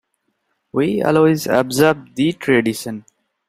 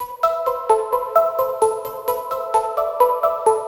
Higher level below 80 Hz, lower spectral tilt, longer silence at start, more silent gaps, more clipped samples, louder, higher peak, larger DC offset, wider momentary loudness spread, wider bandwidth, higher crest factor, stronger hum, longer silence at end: about the same, -56 dBFS vs -58 dBFS; first, -5.5 dB/octave vs -3 dB/octave; first, 0.75 s vs 0 s; neither; neither; first, -17 LUFS vs -20 LUFS; about the same, 0 dBFS vs -2 dBFS; neither; first, 12 LU vs 7 LU; second, 16 kHz vs 19 kHz; about the same, 18 dB vs 18 dB; neither; first, 0.5 s vs 0 s